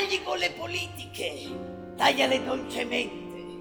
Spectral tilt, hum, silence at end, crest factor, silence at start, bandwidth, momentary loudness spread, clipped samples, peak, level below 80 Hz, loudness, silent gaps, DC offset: -3 dB/octave; none; 0 s; 22 dB; 0 s; over 20 kHz; 15 LU; under 0.1%; -8 dBFS; -60 dBFS; -28 LUFS; none; under 0.1%